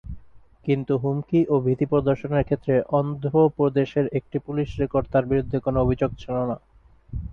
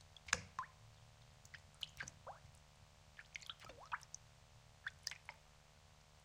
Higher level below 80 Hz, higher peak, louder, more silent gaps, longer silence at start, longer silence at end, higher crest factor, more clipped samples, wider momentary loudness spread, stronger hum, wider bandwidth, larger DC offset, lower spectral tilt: first, -42 dBFS vs -70 dBFS; first, -8 dBFS vs -16 dBFS; first, -23 LUFS vs -50 LUFS; neither; about the same, 0.05 s vs 0 s; about the same, 0 s vs 0 s; second, 16 dB vs 38 dB; neither; second, 8 LU vs 23 LU; neither; second, 6.6 kHz vs 16.5 kHz; neither; first, -10 dB/octave vs -1 dB/octave